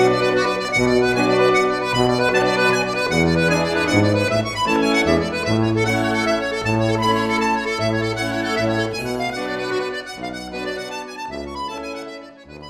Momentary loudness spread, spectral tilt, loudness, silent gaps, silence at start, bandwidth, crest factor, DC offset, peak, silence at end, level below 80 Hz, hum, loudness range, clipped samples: 12 LU; -5 dB/octave; -19 LUFS; none; 0 s; 15 kHz; 16 dB; under 0.1%; -2 dBFS; 0 s; -44 dBFS; none; 8 LU; under 0.1%